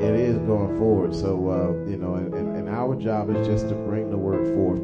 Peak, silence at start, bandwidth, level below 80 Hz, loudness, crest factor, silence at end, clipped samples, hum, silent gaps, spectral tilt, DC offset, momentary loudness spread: -8 dBFS; 0 s; 8 kHz; -44 dBFS; -24 LUFS; 14 dB; 0 s; under 0.1%; none; none; -9.5 dB/octave; under 0.1%; 6 LU